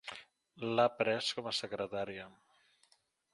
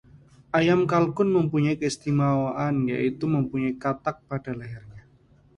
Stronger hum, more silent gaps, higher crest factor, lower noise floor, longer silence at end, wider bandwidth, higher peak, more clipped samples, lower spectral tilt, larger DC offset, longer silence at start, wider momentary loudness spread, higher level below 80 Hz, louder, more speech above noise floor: neither; neither; about the same, 22 dB vs 18 dB; first, -72 dBFS vs -57 dBFS; first, 1.05 s vs 0.6 s; about the same, 11.5 kHz vs 11.5 kHz; second, -16 dBFS vs -6 dBFS; neither; second, -4 dB/octave vs -7 dB/octave; neither; second, 0.05 s vs 0.55 s; first, 17 LU vs 12 LU; second, -76 dBFS vs -56 dBFS; second, -35 LUFS vs -25 LUFS; about the same, 37 dB vs 34 dB